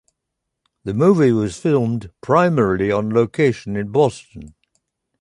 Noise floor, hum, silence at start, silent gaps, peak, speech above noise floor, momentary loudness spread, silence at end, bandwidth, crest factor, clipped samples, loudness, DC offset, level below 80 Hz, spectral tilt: -79 dBFS; none; 0.85 s; none; -2 dBFS; 61 dB; 11 LU; 0.7 s; 11.5 kHz; 16 dB; under 0.1%; -18 LUFS; under 0.1%; -48 dBFS; -7.5 dB/octave